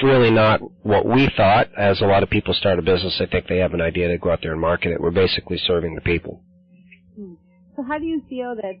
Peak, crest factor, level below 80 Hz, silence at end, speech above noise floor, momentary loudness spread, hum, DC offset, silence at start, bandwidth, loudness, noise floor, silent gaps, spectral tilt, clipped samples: -8 dBFS; 12 dB; -40 dBFS; 0.05 s; 31 dB; 12 LU; none; under 0.1%; 0 s; 6.2 kHz; -19 LUFS; -50 dBFS; none; -8.5 dB/octave; under 0.1%